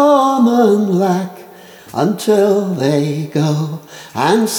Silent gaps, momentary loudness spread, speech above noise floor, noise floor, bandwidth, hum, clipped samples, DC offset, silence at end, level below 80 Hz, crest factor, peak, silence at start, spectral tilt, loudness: none; 13 LU; 24 dB; -38 dBFS; over 20 kHz; none; under 0.1%; under 0.1%; 0 s; -68 dBFS; 14 dB; 0 dBFS; 0 s; -6 dB/octave; -14 LUFS